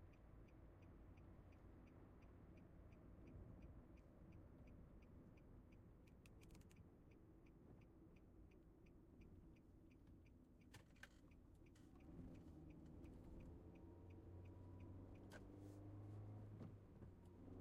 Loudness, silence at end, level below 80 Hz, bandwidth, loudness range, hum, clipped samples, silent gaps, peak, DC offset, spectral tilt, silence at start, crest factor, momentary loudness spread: -65 LUFS; 0 s; -70 dBFS; 9.6 kHz; 8 LU; none; under 0.1%; none; -46 dBFS; under 0.1%; -7.5 dB/octave; 0 s; 18 dB; 9 LU